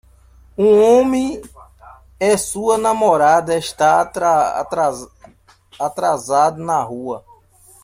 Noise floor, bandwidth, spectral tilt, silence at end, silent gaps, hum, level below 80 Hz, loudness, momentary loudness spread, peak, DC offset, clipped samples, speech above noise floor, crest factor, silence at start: -49 dBFS; 16 kHz; -4.5 dB/octave; 0.65 s; none; none; -50 dBFS; -16 LUFS; 13 LU; -2 dBFS; under 0.1%; under 0.1%; 33 dB; 16 dB; 0.6 s